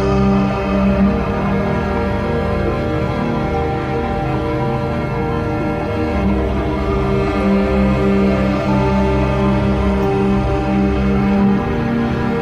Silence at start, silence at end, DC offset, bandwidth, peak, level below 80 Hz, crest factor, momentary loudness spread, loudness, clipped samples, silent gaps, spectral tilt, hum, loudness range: 0 s; 0 s; under 0.1%; 8.6 kHz; -2 dBFS; -24 dBFS; 12 dB; 5 LU; -17 LUFS; under 0.1%; none; -8.5 dB/octave; none; 3 LU